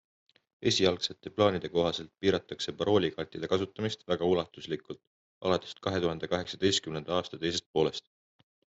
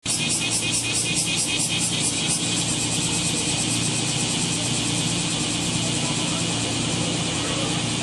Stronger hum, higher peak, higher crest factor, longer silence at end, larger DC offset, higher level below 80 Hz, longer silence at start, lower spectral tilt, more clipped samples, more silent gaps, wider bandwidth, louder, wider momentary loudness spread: neither; about the same, -10 dBFS vs -8 dBFS; first, 22 dB vs 14 dB; first, 0.75 s vs 0 s; neither; second, -64 dBFS vs -48 dBFS; first, 0.6 s vs 0.05 s; first, -4.5 dB/octave vs -2.5 dB/octave; neither; first, 5.07-5.41 s, 7.66-7.74 s vs none; second, 8.2 kHz vs 13.5 kHz; second, -31 LUFS vs -22 LUFS; first, 10 LU vs 2 LU